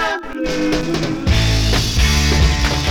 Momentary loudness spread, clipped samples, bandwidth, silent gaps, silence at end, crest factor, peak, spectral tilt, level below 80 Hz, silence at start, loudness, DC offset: 6 LU; under 0.1%; 18.5 kHz; none; 0 s; 14 dB; -2 dBFS; -4.5 dB/octave; -20 dBFS; 0 s; -16 LUFS; under 0.1%